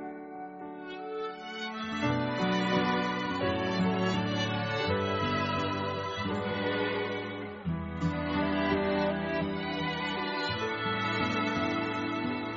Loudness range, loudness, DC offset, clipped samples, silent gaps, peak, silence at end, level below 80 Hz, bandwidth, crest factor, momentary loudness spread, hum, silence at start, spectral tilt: 2 LU; -31 LUFS; under 0.1%; under 0.1%; none; -14 dBFS; 0 s; -58 dBFS; 7.4 kHz; 16 dB; 9 LU; none; 0 s; -4 dB/octave